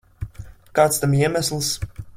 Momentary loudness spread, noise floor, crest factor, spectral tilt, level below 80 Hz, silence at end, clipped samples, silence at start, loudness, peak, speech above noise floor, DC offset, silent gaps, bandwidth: 18 LU; -40 dBFS; 20 dB; -4.5 dB/octave; -42 dBFS; 0.05 s; under 0.1%; 0.2 s; -20 LUFS; -2 dBFS; 20 dB; under 0.1%; none; 16.5 kHz